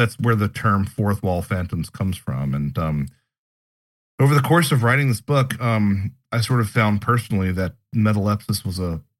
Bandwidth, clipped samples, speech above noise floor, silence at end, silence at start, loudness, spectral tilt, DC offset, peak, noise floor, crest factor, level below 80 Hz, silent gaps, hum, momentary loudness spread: 16.5 kHz; under 0.1%; over 70 dB; 0.2 s; 0 s; -21 LUFS; -6.5 dB/octave; under 0.1%; -4 dBFS; under -90 dBFS; 16 dB; -46 dBFS; 3.38-4.18 s; none; 9 LU